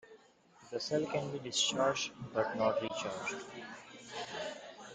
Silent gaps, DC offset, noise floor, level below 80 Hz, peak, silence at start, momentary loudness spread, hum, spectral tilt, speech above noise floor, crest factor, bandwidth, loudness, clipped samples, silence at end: none; under 0.1%; -63 dBFS; -74 dBFS; -18 dBFS; 0.05 s; 15 LU; none; -3 dB/octave; 27 dB; 20 dB; 9.6 kHz; -36 LUFS; under 0.1%; 0 s